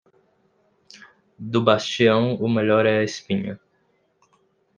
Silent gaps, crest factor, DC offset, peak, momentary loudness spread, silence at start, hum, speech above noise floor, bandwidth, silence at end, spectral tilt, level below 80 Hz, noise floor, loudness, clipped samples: none; 22 dB; under 0.1%; -2 dBFS; 13 LU; 0.95 s; none; 46 dB; 9.4 kHz; 1.2 s; -6 dB/octave; -66 dBFS; -66 dBFS; -20 LUFS; under 0.1%